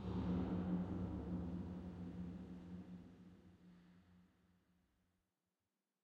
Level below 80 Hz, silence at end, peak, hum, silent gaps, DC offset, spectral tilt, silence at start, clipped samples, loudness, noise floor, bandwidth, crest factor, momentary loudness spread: -60 dBFS; 1.8 s; -30 dBFS; none; none; under 0.1%; -9.5 dB/octave; 0 s; under 0.1%; -46 LUFS; under -90 dBFS; 6.4 kHz; 18 dB; 23 LU